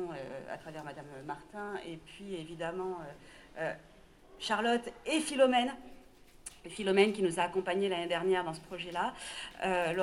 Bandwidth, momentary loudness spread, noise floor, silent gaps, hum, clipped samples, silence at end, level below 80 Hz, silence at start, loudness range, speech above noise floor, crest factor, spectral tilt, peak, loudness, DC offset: 12.5 kHz; 19 LU; -57 dBFS; none; none; under 0.1%; 0 s; -64 dBFS; 0 s; 11 LU; 23 dB; 22 dB; -4 dB/octave; -12 dBFS; -34 LUFS; under 0.1%